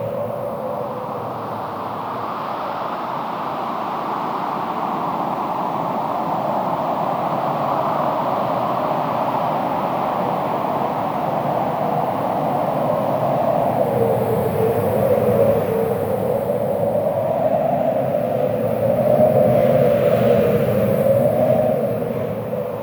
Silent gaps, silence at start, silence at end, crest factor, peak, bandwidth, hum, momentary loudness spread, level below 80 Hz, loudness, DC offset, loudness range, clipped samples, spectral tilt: none; 0 s; 0 s; 16 dB; -4 dBFS; over 20 kHz; none; 9 LU; -52 dBFS; -20 LUFS; under 0.1%; 8 LU; under 0.1%; -8 dB/octave